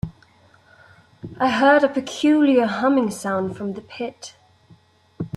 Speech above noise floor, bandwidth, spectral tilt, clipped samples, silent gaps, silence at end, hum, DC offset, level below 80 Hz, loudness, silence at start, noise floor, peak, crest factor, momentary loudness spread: 35 dB; 12.5 kHz; -5.5 dB/octave; under 0.1%; none; 0.1 s; none; under 0.1%; -56 dBFS; -20 LUFS; 0.05 s; -54 dBFS; -6 dBFS; 16 dB; 22 LU